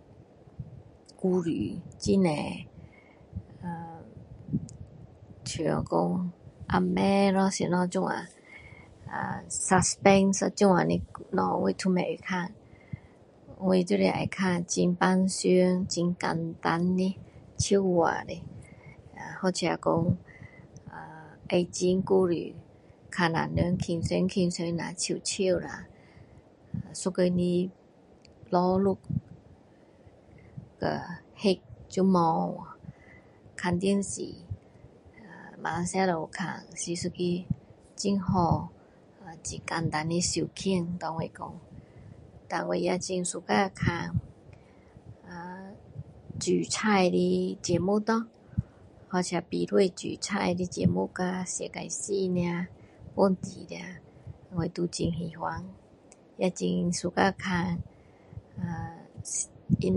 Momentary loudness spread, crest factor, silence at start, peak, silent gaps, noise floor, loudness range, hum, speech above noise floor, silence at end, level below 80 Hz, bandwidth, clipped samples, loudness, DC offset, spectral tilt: 21 LU; 24 dB; 0.2 s; -6 dBFS; none; -57 dBFS; 6 LU; none; 29 dB; 0 s; -52 dBFS; 11.5 kHz; under 0.1%; -28 LUFS; under 0.1%; -5.5 dB/octave